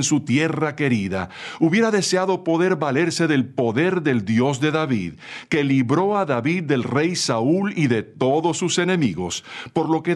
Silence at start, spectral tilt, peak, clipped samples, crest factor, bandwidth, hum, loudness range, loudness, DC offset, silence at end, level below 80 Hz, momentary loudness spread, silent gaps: 0 s; -5 dB/octave; -4 dBFS; under 0.1%; 16 dB; 12 kHz; none; 1 LU; -20 LUFS; under 0.1%; 0 s; -60 dBFS; 6 LU; none